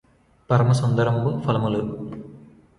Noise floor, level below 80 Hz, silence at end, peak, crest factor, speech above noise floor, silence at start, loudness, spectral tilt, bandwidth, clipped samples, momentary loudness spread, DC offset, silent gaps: -46 dBFS; -52 dBFS; 0.4 s; -4 dBFS; 18 dB; 26 dB; 0.5 s; -22 LUFS; -7.5 dB/octave; 11.5 kHz; under 0.1%; 15 LU; under 0.1%; none